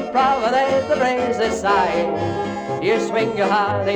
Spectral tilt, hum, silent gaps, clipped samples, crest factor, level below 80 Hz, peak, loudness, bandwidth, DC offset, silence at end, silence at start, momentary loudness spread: -5 dB/octave; none; none; under 0.1%; 12 dB; -50 dBFS; -6 dBFS; -19 LUFS; 19 kHz; under 0.1%; 0 s; 0 s; 5 LU